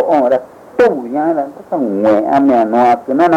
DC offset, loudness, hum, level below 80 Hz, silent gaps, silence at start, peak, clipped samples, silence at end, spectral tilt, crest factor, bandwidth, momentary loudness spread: under 0.1%; -13 LUFS; none; -54 dBFS; none; 0 s; -2 dBFS; under 0.1%; 0 s; -7.5 dB/octave; 10 dB; 10.5 kHz; 8 LU